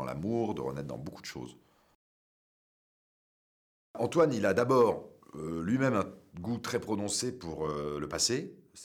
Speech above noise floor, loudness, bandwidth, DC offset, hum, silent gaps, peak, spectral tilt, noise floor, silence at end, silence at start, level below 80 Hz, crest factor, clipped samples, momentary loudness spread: over 59 dB; -31 LUFS; 17 kHz; under 0.1%; none; 1.95-3.94 s; -14 dBFS; -4.5 dB/octave; under -90 dBFS; 0 s; 0 s; -62 dBFS; 20 dB; under 0.1%; 16 LU